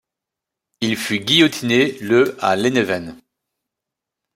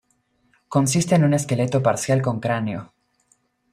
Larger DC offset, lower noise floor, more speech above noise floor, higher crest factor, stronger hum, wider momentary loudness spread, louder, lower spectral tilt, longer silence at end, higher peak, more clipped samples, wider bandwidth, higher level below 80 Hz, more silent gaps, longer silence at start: neither; first, -84 dBFS vs -66 dBFS; first, 67 dB vs 46 dB; about the same, 18 dB vs 18 dB; neither; first, 10 LU vs 7 LU; first, -17 LUFS vs -21 LUFS; second, -4 dB/octave vs -6 dB/octave; first, 1.2 s vs 0.9 s; about the same, -2 dBFS vs -4 dBFS; neither; first, 16 kHz vs 14.5 kHz; about the same, -60 dBFS vs -58 dBFS; neither; about the same, 0.8 s vs 0.7 s